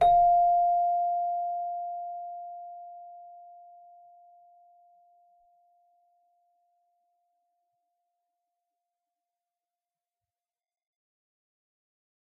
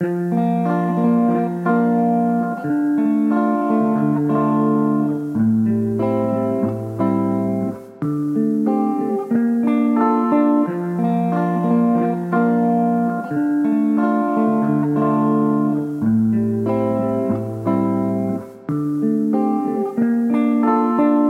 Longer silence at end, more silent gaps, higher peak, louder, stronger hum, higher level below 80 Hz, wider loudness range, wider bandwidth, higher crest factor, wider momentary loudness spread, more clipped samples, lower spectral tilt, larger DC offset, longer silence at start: first, 8.85 s vs 0 s; neither; second, -12 dBFS vs -6 dBFS; second, -26 LUFS vs -19 LUFS; neither; about the same, -60 dBFS vs -60 dBFS; first, 25 LU vs 2 LU; about the same, 4 kHz vs 4.1 kHz; first, 20 dB vs 12 dB; first, 26 LU vs 5 LU; neither; second, -2.5 dB/octave vs -10 dB/octave; neither; about the same, 0 s vs 0 s